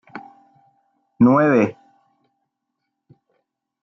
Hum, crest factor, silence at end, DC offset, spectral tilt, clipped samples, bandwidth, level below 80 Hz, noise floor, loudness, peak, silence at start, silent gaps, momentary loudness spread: none; 18 dB; 2.1 s; under 0.1%; -9 dB/octave; under 0.1%; 6.2 kHz; -66 dBFS; -78 dBFS; -16 LUFS; -4 dBFS; 0.15 s; none; 25 LU